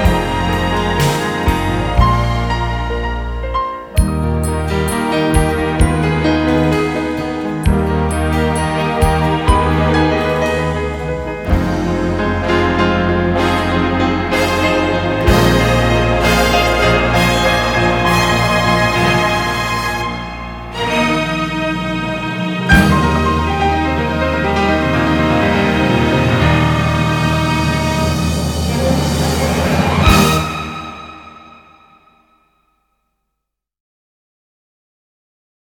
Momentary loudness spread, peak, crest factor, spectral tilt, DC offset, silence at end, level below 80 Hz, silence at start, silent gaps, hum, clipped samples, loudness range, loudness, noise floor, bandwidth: 7 LU; 0 dBFS; 14 dB; -5.5 dB/octave; under 0.1%; 4.15 s; -24 dBFS; 0 s; none; none; under 0.1%; 4 LU; -15 LUFS; -77 dBFS; 19 kHz